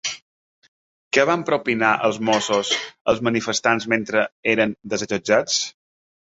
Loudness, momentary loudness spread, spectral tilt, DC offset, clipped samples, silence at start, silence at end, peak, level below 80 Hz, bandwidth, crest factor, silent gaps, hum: -20 LUFS; 6 LU; -3 dB/octave; under 0.1%; under 0.1%; 0.05 s; 0.6 s; -2 dBFS; -60 dBFS; 8 kHz; 20 dB; 0.22-0.62 s, 0.68-1.11 s, 3.01-3.05 s, 4.32-4.43 s; none